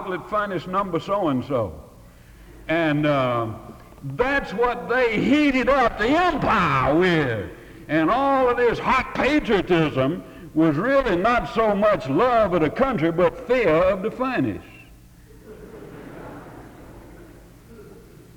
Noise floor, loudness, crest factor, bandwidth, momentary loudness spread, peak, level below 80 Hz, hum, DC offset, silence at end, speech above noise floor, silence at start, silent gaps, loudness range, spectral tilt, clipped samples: -47 dBFS; -21 LUFS; 14 dB; 19.5 kHz; 18 LU; -8 dBFS; -44 dBFS; none; under 0.1%; 0.35 s; 27 dB; 0 s; none; 5 LU; -7 dB/octave; under 0.1%